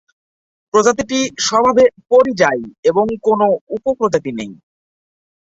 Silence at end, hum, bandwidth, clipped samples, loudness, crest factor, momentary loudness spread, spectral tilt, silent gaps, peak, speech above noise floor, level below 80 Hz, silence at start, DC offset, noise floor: 1.05 s; none; 8 kHz; under 0.1%; -15 LUFS; 16 dB; 8 LU; -3.5 dB/octave; 2.78-2.83 s, 3.61-3.67 s; -2 dBFS; over 75 dB; -52 dBFS; 0.75 s; under 0.1%; under -90 dBFS